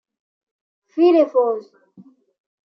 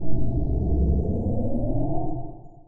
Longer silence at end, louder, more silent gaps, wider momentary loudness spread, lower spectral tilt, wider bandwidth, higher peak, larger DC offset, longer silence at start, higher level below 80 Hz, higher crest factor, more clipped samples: first, 1.05 s vs 0 s; first, -17 LUFS vs -27 LUFS; neither; first, 15 LU vs 9 LU; second, -6.5 dB/octave vs -14.5 dB/octave; first, 6 kHz vs 1.1 kHz; first, -4 dBFS vs -8 dBFS; neither; first, 0.95 s vs 0 s; second, -84 dBFS vs -28 dBFS; first, 18 dB vs 12 dB; neither